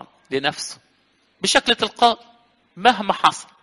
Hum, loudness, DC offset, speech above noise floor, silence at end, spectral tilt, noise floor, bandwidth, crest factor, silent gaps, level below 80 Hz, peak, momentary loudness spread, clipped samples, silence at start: none; -19 LUFS; under 0.1%; 42 dB; 0.2 s; -2 dB/octave; -62 dBFS; 11.5 kHz; 22 dB; none; -56 dBFS; 0 dBFS; 12 LU; under 0.1%; 0.3 s